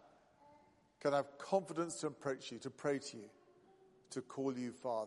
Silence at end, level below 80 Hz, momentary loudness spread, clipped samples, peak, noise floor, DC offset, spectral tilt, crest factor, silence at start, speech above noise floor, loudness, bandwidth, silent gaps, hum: 0 s; -84 dBFS; 12 LU; under 0.1%; -22 dBFS; -69 dBFS; under 0.1%; -5 dB/octave; 22 dB; 0.05 s; 28 dB; -41 LUFS; 11.5 kHz; none; none